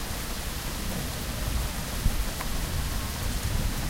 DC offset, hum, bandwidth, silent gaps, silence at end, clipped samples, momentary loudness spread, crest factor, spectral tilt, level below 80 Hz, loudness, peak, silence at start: under 0.1%; none; 16.5 kHz; none; 0 s; under 0.1%; 3 LU; 18 dB; -4 dB/octave; -32 dBFS; -31 LUFS; -10 dBFS; 0 s